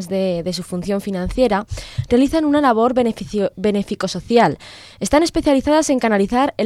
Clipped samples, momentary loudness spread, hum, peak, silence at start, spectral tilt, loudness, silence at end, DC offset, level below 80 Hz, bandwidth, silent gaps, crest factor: under 0.1%; 9 LU; none; -2 dBFS; 0 s; -5.5 dB/octave; -18 LUFS; 0 s; under 0.1%; -38 dBFS; 14.5 kHz; none; 16 dB